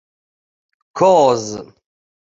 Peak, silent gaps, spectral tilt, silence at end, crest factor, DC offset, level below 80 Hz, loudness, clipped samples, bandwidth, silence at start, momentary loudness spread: -2 dBFS; none; -5 dB/octave; 0.6 s; 16 dB; under 0.1%; -60 dBFS; -14 LUFS; under 0.1%; 7.8 kHz; 0.95 s; 20 LU